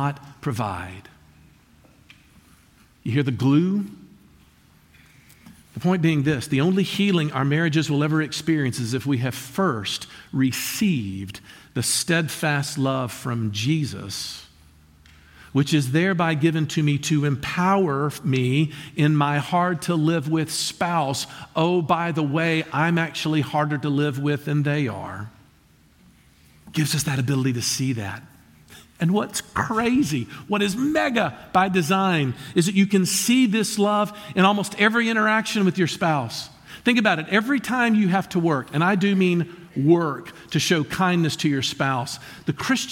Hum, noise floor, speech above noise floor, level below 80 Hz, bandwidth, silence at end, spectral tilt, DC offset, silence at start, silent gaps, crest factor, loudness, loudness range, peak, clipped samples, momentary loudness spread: none; -56 dBFS; 34 dB; -58 dBFS; 17 kHz; 0 s; -5 dB/octave; under 0.1%; 0 s; none; 18 dB; -22 LUFS; 6 LU; -4 dBFS; under 0.1%; 9 LU